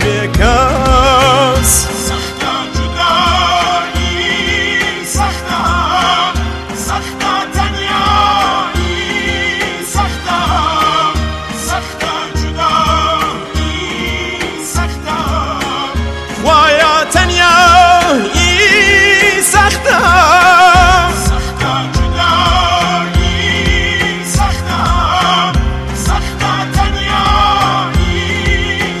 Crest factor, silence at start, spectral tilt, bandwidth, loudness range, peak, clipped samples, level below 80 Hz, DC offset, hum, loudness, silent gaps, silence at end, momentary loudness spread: 12 dB; 0 s; -3.5 dB/octave; 13 kHz; 8 LU; 0 dBFS; under 0.1%; -22 dBFS; under 0.1%; none; -11 LUFS; none; 0 s; 11 LU